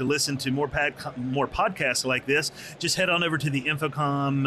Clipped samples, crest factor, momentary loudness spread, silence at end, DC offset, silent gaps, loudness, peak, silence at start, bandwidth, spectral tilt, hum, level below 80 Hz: under 0.1%; 14 dB; 5 LU; 0 s; under 0.1%; none; -25 LUFS; -12 dBFS; 0 s; 13.5 kHz; -4 dB/octave; none; -52 dBFS